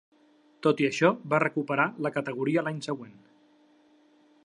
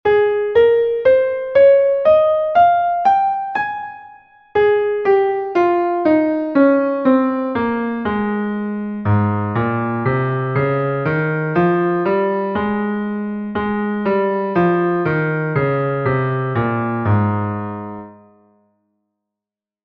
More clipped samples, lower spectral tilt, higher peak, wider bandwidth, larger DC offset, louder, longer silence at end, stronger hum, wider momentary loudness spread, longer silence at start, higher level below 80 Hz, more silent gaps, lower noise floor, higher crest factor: neither; second, -6 dB/octave vs -10 dB/octave; second, -8 dBFS vs -2 dBFS; first, 11 kHz vs 6 kHz; neither; second, -27 LUFS vs -17 LUFS; second, 1.35 s vs 1.7 s; neither; about the same, 11 LU vs 9 LU; first, 0.6 s vs 0.05 s; second, -80 dBFS vs -50 dBFS; neither; second, -62 dBFS vs -87 dBFS; first, 22 dB vs 14 dB